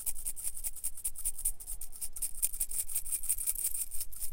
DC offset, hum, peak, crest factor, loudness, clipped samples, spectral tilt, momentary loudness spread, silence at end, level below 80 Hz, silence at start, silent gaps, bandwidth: under 0.1%; none; -12 dBFS; 22 dB; -34 LUFS; under 0.1%; 0.5 dB/octave; 7 LU; 0 s; -46 dBFS; 0 s; none; 17 kHz